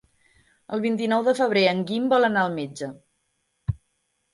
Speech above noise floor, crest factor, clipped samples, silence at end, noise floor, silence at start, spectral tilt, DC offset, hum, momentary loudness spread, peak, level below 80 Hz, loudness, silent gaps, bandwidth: 51 dB; 18 dB; under 0.1%; 0.55 s; -73 dBFS; 0.7 s; -6 dB/octave; under 0.1%; none; 15 LU; -6 dBFS; -52 dBFS; -23 LUFS; none; 11.5 kHz